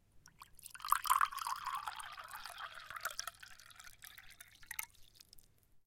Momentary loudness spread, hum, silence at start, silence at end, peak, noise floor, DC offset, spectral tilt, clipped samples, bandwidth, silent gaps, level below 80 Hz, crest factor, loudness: 25 LU; none; 0.15 s; 0.05 s; -16 dBFS; -63 dBFS; under 0.1%; 1.5 dB/octave; under 0.1%; 17 kHz; none; -70 dBFS; 28 dB; -40 LUFS